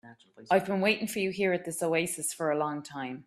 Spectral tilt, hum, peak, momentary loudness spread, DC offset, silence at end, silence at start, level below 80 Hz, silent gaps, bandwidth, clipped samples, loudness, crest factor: -4 dB/octave; none; -12 dBFS; 5 LU; under 0.1%; 0.05 s; 0.05 s; -72 dBFS; none; 15.5 kHz; under 0.1%; -29 LUFS; 20 dB